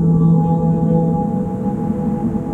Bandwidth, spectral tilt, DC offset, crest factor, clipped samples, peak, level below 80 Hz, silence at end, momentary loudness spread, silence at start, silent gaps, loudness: 2.1 kHz; -12 dB/octave; under 0.1%; 12 dB; under 0.1%; -4 dBFS; -36 dBFS; 0 s; 7 LU; 0 s; none; -17 LUFS